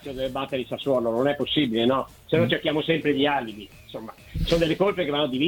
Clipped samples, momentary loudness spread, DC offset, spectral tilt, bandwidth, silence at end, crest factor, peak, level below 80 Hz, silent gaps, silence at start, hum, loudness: under 0.1%; 15 LU; under 0.1%; -6 dB/octave; 19 kHz; 0 s; 16 dB; -8 dBFS; -42 dBFS; none; 0 s; none; -24 LUFS